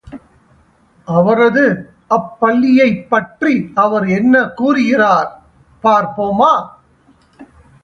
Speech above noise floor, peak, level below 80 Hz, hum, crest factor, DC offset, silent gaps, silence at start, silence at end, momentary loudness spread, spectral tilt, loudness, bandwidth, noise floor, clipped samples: 39 dB; 0 dBFS; -52 dBFS; none; 14 dB; under 0.1%; none; 0.05 s; 0.4 s; 7 LU; -7 dB/octave; -13 LUFS; 6.8 kHz; -51 dBFS; under 0.1%